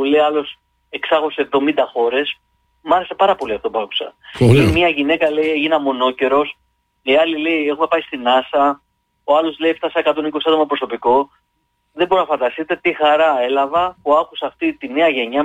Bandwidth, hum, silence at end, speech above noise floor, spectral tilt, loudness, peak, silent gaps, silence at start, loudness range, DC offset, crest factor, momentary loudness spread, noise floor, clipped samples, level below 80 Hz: 13.5 kHz; none; 0 s; 51 dB; -6.5 dB/octave; -17 LUFS; -2 dBFS; none; 0 s; 2 LU; under 0.1%; 16 dB; 9 LU; -67 dBFS; under 0.1%; -46 dBFS